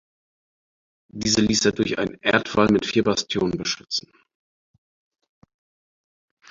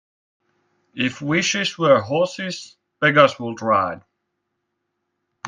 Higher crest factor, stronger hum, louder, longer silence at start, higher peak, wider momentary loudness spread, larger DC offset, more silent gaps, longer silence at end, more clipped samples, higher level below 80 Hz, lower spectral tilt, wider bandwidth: about the same, 22 dB vs 22 dB; neither; second, -22 LUFS vs -19 LUFS; first, 1.15 s vs 0.95 s; about the same, -2 dBFS vs 0 dBFS; second, 9 LU vs 14 LU; neither; neither; first, 2.5 s vs 0 s; neither; first, -52 dBFS vs -66 dBFS; about the same, -3.5 dB/octave vs -4 dB/octave; second, 7.8 kHz vs 9.6 kHz